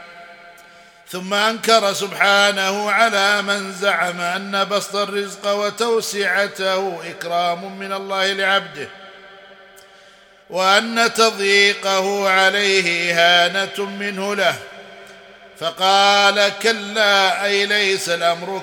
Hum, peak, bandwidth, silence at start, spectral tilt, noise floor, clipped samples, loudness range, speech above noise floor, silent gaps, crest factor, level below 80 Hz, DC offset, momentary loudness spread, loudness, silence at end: none; 0 dBFS; 17.5 kHz; 0 s; -2 dB/octave; -48 dBFS; under 0.1%; 6 LU; 30 dB; none; 18 dB; -70 dBFS; under 0.1%; 11 LU; -17 LUFS; 0 s